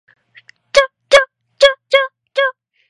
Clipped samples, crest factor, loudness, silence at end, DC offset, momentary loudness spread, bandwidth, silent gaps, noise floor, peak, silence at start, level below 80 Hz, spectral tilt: 0.1%; 16 dB; -14 LUFS; 0.4 s; under 0.1%; 8 LU; 11.5 kHz; none; -48 dBFS; 0 dBFS; 0.75 s; -52 dBFS; 1 dB/octave